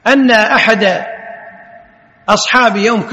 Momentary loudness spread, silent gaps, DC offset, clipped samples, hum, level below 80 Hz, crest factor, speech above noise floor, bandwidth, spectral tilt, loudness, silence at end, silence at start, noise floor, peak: 17 LU; none; under 0.1%; 0.4%; none; -52 dBFS; 12 dB; 33 dB; 11 kHz; -3.5 dB/octave; -10 LUFS; 0 s; 0.05 s; -44 dBFS; 0 dBFS